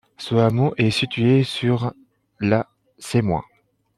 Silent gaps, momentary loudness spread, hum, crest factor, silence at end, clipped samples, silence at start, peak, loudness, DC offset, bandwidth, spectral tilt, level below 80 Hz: none; 9 LU; none; 16 dB; 0.55 s; under 0.1%; 0.2 s; -4 dBFS; -21 LUFS; under 0.1%; 12.5 kHz; -6.5 dB/octave; -54 dBFS